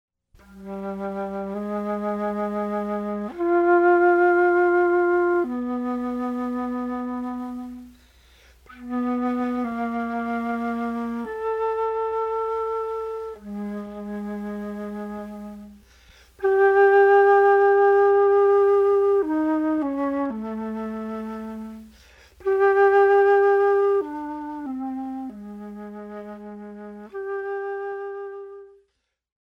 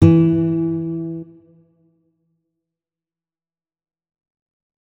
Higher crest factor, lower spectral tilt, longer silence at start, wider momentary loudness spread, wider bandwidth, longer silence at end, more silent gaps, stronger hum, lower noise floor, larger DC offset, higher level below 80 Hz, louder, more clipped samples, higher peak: second, 14 dB vs 20 dB; second, -7.5 dB/octave vs -10.5 dB/octave; first, 0.5 s vs 0 s; first, 20 LU vs 16 LU; first, 6 kHz vs 4.1 kHz; second, 0.75 s vs 3.55 s; neither; neither; second, -74 dBFS vs under -90 dBFS; neither; second, -58 dBFS vs -52 dBFS; second, -22 LUFS vs -18 LUFS; neither; second, -8 dBFS vs 0 dBFS